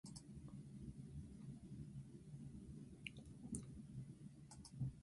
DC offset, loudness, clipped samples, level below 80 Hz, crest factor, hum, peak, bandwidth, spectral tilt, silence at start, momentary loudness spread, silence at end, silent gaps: under 0.1%; -56 LUFS; under 0.1%; -66 dBFS; 24 dB; none; -30 dBFS; 11.5 kHz; -5.5 dB/octave; 0.05 s; 6 LU; 0 s; none